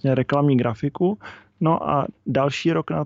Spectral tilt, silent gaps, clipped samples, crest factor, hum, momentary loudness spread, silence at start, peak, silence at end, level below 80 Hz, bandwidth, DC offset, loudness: -7.5 dB/octave; none; under 0.1%; 14 dB; none; 6 LU; 0.05 s; -6 dBFS; 0 s; -54 dBFS; 7.8 kHz; under 0.1%; -22 LUFS